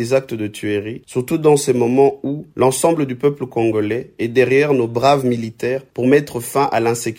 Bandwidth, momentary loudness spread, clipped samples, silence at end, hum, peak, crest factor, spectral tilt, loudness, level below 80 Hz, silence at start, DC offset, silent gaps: 16.5 kHz; 9 LU; under 0.1%; 0.05 s; none; -2 dBFS; 16 dB; -5.5 dB/octave; -17 LUFS; -56 dBFS; 0 s; under 0.1%; none